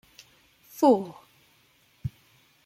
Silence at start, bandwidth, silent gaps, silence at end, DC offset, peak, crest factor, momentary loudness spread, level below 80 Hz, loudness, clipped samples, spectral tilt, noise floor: 0.8 s; 16.5 kHz; none; 0.6 s; under 0.1%; -8 dBFS; 20 dB; 20 LU; -60 dBFS; -26 LUFS; under 0.1%; -7 dB/octave; -63 dBFS